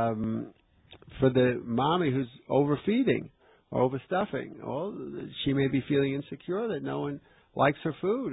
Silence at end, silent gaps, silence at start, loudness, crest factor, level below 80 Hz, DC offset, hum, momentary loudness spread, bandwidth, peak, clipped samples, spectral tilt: 0 s; none; 0 s; -29 LUFS; 18 dB; -58 dBFS; under 0.1%; none; 11 LU; 4 kHz; -10 dBFS; under 0.1%; -11 dB/octave